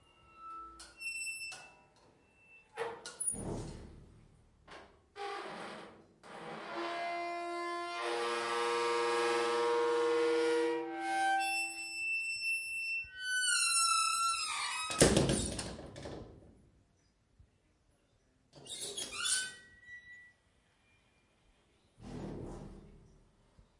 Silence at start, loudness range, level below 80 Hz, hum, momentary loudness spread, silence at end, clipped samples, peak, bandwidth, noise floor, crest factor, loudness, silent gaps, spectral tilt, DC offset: 0.35 s; 17 LU; -58 dBFS; none; 23 LU; 0.75 s; under 0.1%; -10 dBFS; 11.5 kHz; -72 dBFS; 28 dB; -34 LUFS; none; -2.5 dB/octave; under 0.1%